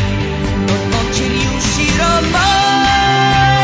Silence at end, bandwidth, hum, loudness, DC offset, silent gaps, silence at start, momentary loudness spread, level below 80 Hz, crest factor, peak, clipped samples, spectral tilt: 0 s; 8 kHz; none; -13 LUFS; under 0.1%; none; 0 s; 6 LU; -24 dBFS; 12 dB; 0 dBFS; under 0.1%; -4 dB/octave